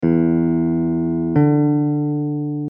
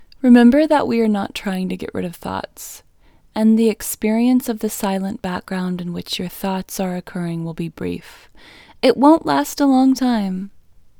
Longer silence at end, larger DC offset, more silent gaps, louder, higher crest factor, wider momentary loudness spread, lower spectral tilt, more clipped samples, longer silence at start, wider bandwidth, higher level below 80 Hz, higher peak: second, 0 s vs 0.5 s; neither; neither; about the same, -18 LUFS vs -18 LUFS; about the same, 14 dB vs 18 dB; second, 6 LU vs 14 LU; first, -13.5 dB/octave vs -5.5 dB/octave; neither; second, 0 s vs 0.25 s; second, 3.1 kHz vs 20 kHz; about the same, -46 dBFS vs -50 dBFS; second, -4 dBFS vs 0 dBFS